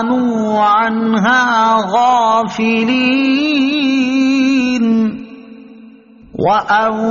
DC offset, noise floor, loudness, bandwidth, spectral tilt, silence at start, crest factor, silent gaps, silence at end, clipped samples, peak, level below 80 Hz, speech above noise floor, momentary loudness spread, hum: under 0.1%; -40 dBFS; -13 LUFS; 7.2 kHz; -3 dB/octave; 0 s; 12 dB; none; 0 s; under 0.1%; -2 dBFS; -54 dBFS; 28 dB; 4 LU; none